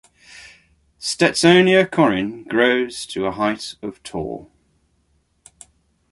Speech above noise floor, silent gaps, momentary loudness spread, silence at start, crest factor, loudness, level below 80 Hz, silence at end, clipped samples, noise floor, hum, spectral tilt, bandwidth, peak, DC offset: 46 dB; none; 17 LU; 0.35 s; 18 dB; -18 LUFS; -54 dBFS; 1.65 s; under 0.1%; -64 dBFS; none; -4.5 dB/octave; 11.5 kHz; -2 dBFS; under 0.1%